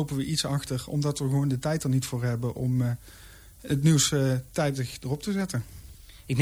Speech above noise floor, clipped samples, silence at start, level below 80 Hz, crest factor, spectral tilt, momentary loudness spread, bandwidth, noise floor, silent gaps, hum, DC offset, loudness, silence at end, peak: 20 dB; under 0.1%; 0 s; -50 dBFS; 16 dB; -5 dB/octave; 10 LU; 19.5 kHz; -47 dBFS; none; none; under 0.1%; -27 LUFS; 0 s; -12 dBFS